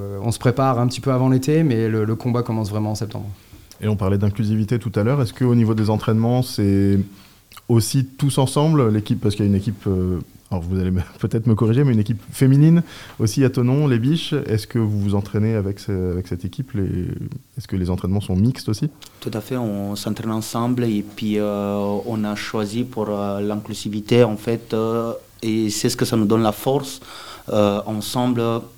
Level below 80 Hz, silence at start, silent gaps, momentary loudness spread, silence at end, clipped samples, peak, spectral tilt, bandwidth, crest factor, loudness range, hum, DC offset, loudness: -50 dBFS; 0 s; none; 10 LU; 0.1 s; under 0.1%; -2 dBFS; -7 dB/octave; 17 kHz; 18 dB; 5 LU; none; 0.3%; -20 LUFS